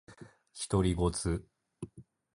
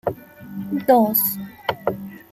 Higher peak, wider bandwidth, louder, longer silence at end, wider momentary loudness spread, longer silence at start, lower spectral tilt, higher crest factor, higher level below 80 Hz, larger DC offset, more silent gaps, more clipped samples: second, -14 dBFS vs -4 dBFS; second, 11.5 kHz vs 16 kHz; second, -32 LUFS vs -20 LUFS; first, 0.35 s vs 0.15 s; about the same, 20 LU vs 19 LU; about the same, 0.1 s vs 0.05 s; about the same, -6 dB/octave vs -5 dB/octave; about the same, 20 dB vs 18 dB; first, -44 dBFS vs -60 dBFS; neither; neither; neither